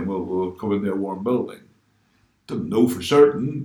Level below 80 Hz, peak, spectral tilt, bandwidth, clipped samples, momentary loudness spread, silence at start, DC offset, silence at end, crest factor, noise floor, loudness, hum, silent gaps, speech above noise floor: -58 dBFS; -2 dBFS; -6.5 dB/octave; 19.5 kHz; under 0.1%; 12 LU; 0 s; under 0.1%; 0 s; 20 dB; -63 dBFS; -21 LUFS; none; none; 42 dB